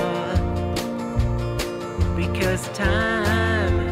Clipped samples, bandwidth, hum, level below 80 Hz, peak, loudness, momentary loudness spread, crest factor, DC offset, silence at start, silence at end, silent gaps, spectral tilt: under 0.1%; 16 kHz; none; -30 dBFS; -10 dBFS; -23 LUFS; 6 LU; 12 dB; under 0.1%; 0 s; 0 s; none; -6 dB/octave